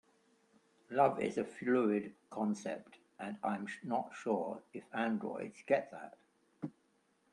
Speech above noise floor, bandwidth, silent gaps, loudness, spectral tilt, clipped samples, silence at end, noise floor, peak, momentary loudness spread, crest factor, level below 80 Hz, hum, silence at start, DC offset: 38 dB; 11 kHz; none; -37 LUFS; -6.5 dB/octave; under 0.1%; 0.65 s; -75 dBFS; -16 dBFS; 16 LU; 22 dB; -82 dBFS; none; 0.9 s; under 0.1%